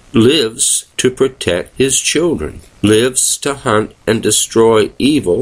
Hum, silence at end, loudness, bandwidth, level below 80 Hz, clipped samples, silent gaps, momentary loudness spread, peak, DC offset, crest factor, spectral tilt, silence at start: none; 0 s; -13 LUFS; 16 kHz; -40 dBFS; under 0.1%; none; 7 LU; 0 dBFS; under 0.1%; 14 dB; -3.5 dB/octave; 0.15 s